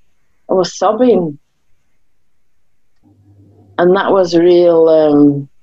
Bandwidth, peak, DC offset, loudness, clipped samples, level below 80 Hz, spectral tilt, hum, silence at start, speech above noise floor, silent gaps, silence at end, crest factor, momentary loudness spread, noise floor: 7.8 kHz; 0 dBFS; 0.4%; -11 LUFS; under 0.1%; -54 dBFS; -6.5 dB/octave; none; 0.5 s; 57 dB; none; 0.15 s; 12 dB; 7 LU; -67 dBFS